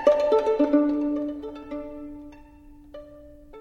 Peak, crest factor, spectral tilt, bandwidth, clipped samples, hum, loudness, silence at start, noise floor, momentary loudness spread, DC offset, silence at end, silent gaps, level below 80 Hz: -6 dBFS; 20 dB; -6 dB/octave; 7.2 kHz; under 0.1%; none; -24 LUFS; 0 s; -48 dBFS; 24 LU; under 0.1%; 0 s; none; -52 dBFS